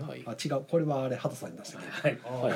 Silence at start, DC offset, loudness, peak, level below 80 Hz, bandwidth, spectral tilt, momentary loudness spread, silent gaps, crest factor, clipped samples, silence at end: 0 s; under 0.1%; -33 LUFS; -14 dBFS; -76 dBFS; 16.5 kHz; -6 dB/octave; 12 LU; none; 18 dB; under 0.1%; 0 s